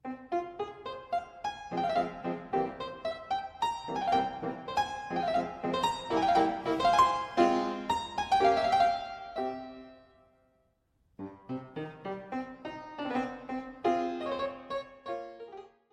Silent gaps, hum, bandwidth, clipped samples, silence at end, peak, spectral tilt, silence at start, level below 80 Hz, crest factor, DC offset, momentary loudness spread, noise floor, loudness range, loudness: none; none; 13.5 kHz; under 0.1%; 0.25 s; -12 dBFS; -5 dB/octave; 0.05 s; -62 dBFS; 20 dB; under 0.1%; 16 LU; -72 dBFS; 13 LU; -32 LUFS